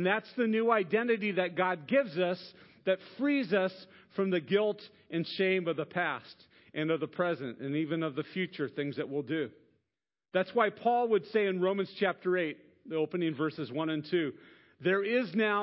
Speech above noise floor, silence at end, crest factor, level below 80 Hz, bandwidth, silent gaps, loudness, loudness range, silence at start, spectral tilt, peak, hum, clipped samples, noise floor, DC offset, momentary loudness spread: over 59 dB; 0 s; 20 dB; -82 dBFS; 5.8 kHz; none; -32 LUFS; 4 LU; 0 s; -9.5 dB/octave; -12 dBFS; none; under 0.1%; under -90 dBFS; under 0.1%; 8 LU